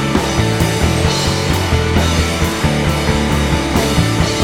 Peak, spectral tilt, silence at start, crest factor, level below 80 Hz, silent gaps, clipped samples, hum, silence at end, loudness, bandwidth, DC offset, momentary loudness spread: 0 dBFS; -5 dB/octave; 0 s; 14 dB; -24 dBFS; none; under 0.1%; none; 0 s; -15 LUFS; 18 kHz; under 0.1%; 1 LU